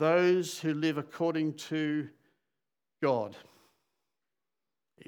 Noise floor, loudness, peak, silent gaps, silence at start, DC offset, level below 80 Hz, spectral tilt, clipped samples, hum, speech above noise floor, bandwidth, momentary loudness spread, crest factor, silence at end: under -90 dBFS; -31 LUFS; -14 dBFS; none; 0 s; under 0.1%; under -90 dBFS; -5.5 dB/octave; under 0.1%; none; over 60 dB; 18 kHz; 8 LU; 18 dB; 1.65 s